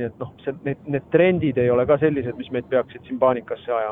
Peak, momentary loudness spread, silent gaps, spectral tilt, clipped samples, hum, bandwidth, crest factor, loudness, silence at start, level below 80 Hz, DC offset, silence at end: -4 dBFS; 12 LU; none; -10.5 dB/octave; under 0.1%; none; 3.9 kHz; 18 dB; -22 LUFS; 0 s; -54 dBFS; under 0.1%; 0 s